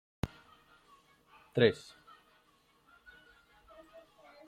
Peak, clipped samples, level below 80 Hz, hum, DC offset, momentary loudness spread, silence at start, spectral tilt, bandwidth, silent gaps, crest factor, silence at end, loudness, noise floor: -10 dBFS; under 0.1%; -62 dBFS; none; under 0.1%; 29 LU; 0.25 s; -6.5 dB/octave; 14 kHz; none; 28 dB; 2.7 s; -33 LUFS; -69 dBFS